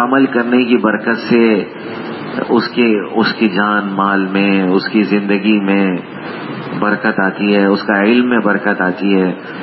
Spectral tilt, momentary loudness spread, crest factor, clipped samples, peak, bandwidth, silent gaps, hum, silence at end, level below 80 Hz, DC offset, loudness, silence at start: -10.5 dB/octave; 11 LU; 14 dB; under 0.1%; 0 dBFS; 5.8 kHz; none; none; 0 s; -60 dBFS; under 0.1%; -14 LUFS; 0 s